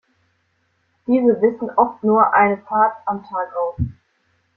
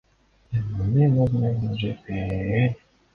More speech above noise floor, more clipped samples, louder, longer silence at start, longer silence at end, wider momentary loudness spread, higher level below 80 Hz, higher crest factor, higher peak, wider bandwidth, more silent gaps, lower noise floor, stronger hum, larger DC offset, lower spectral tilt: first, 48 dB vs 31 dB; neither; first, -18 LUFS vs -24 LUFS; first, 1.1 s vs 0.5 s; first, 0.65 s vs 0.4 s; about the same, 12 LU vs 10 LU; about the same, -46 dBFS vs -44 dBFS; about the same, 18 dB vs 14 dB; first, -2 dBFS vs -10 dBFS; second, 4.2 kHz vs 4.9 kHz; neither; first, -66 dBFS vs -53 dBFS; neither; neither; first, -11 dB/octave vs -9.5 dB/octave